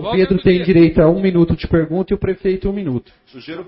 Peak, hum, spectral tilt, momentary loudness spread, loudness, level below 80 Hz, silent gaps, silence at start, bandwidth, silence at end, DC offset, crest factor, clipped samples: -2 dBFS; none; -13 dB/octave; 11 LU; -15 LUFS; -34 dBFS; none; 0 s; 5.6 kHz; 0.05 s; under 0.1%; 14 dB; under 0.1%